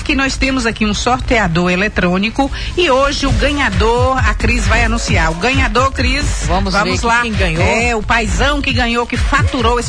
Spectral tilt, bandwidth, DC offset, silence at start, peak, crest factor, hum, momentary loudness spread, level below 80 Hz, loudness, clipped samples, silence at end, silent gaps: -4.5 dB/octave; 10.5 kHz; under 0.1%; 0 s; -2 dBFS; 12 dB; none; 3 LU; -20 dBFS; -14 LUFS; under 0.1%; 0 s; none